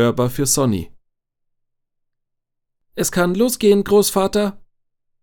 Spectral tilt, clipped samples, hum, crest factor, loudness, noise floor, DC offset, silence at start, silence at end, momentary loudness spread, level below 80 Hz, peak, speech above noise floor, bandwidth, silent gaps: -4.5 dB/octave; under 0.1%; none; 16 dB; -17 LUFS; -76 dBFS; under 0.1%; 0 s; 0.65 s; 11 LU; -46 dBFS; -2 dBFS; 59 dB; 19 kHz; none